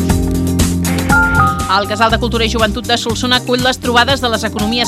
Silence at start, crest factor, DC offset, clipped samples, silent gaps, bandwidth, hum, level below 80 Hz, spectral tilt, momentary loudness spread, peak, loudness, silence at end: 0 s; 14 dB; under 0.1%; under 0.1%; none; 16 kHz; none; -26 dBFS; -4.5 dB/octave; 4 LU; 0 dBFS; -13 LUFS; 0 s